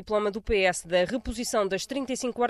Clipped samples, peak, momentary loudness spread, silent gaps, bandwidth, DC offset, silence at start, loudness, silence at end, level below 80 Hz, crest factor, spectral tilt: under 0.1%; -12 dBFS; 6 LU; none; 14.5 kHz; under 0.1%; 0 s; -27 LUFS; 0 s; -44 dBFS; 16 dB; -3.5 dB/octave